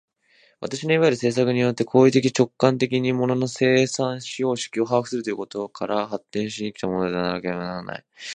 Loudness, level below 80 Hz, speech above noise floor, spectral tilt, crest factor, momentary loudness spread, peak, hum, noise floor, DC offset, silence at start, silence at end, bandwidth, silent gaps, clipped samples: -22 LUFS; -62 dBFS; 38 dB; -5.5 dB/octave; 20 dB; 11 LU; -2 dBFS; none; -60 dBFS; under 0.1%; 0.6 s; 0 s; 10 kHz; none; under 0.1%